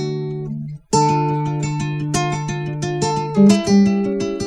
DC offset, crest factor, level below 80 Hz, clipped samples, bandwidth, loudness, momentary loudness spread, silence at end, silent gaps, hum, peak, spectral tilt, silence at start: under 0.1%; 16 dB; -46 dBFS; under 0.1%; 11 kHz; -18 LUFS; 12 LU; 0 s; none; none; -2 dBFS; -6 dB/octave; 0 s